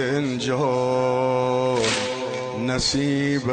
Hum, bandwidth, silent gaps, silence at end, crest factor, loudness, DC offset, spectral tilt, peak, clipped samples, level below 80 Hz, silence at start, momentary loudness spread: none; 9.4 kHz; none; 0 s; 12 dB; -22 LUFS; under 0.1%; -4.5 dB/octave; -10 dBFS; under 0.1%; -48 dBFS; 0 s; 5 LU